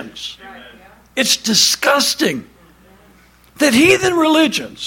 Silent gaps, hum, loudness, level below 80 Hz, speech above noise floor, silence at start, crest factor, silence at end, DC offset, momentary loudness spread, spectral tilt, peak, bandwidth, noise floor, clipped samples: none; none; -13 LUFS; -52 dBFS; 34 dB; 0 s; 16 dB; 0 s; under 0.1%; 17 LU; -2 dB/octave; 0 dBFS; 17 kHz; -48 dBFS; under 0.1%